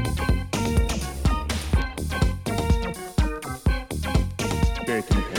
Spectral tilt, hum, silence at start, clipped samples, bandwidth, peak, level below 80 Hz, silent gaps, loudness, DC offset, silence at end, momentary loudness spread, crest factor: -5.5 dB/octave; none; 0 s; under 0.1%; 17.5 kHz; -8 dBFS; -26 dBFS; none; -26 LUFS; under 0.1%; 0 s; 3 LU; 16 dB